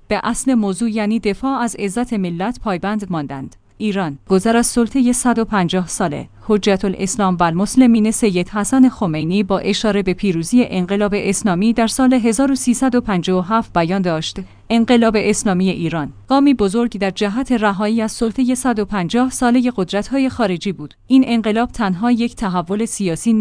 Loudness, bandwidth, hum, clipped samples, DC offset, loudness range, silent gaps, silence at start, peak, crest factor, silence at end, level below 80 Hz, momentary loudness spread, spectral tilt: -17 LUFS; 10.5 kHz; none; under 0.1%; under 0.1%; 3 LU; none; 0.1 s; 0 dBFS; 16 dB; 0 s; -40 dBFS; 7 LU; -5 dB/octave